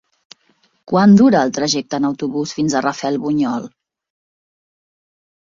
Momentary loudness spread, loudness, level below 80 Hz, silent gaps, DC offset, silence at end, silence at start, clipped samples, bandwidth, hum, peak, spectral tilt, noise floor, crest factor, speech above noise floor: 12 LU; -16 LUFS; -58 dBFS; none; under 0.1%; 1.8 s; 0.9 s; under 0.1%; 7.6 kHz; none; -2 dBFS; -5.5 dB/octave; -60 dBFS; 16 dB; 45 dB